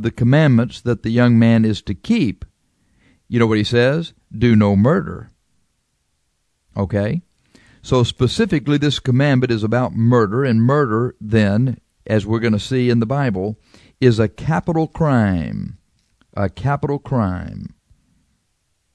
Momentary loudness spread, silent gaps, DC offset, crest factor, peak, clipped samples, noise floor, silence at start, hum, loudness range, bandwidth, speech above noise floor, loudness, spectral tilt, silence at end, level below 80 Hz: 13 LU; none; under 0.1%; 18 dB; 0 dBFS; under 0.1%; -68 dBFS; 0 s; none; 6 LU; 10.5 kHz; 51 dB; -17 LUFS; -7.5 dB/octave; 1.3 s; -44 dBFS